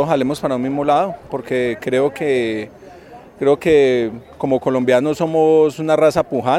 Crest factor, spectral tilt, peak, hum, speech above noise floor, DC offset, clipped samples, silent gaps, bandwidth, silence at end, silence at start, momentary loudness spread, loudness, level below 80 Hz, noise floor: 16 dB; -6.5 dB/octave; -2 dBFS; none; 23 dB; under 0.1%; under 0.1%; none; 13.5 kHz; 0 s; 0 s; 9 LU; -17 LUFS; -52 dBFS; -40 dBFS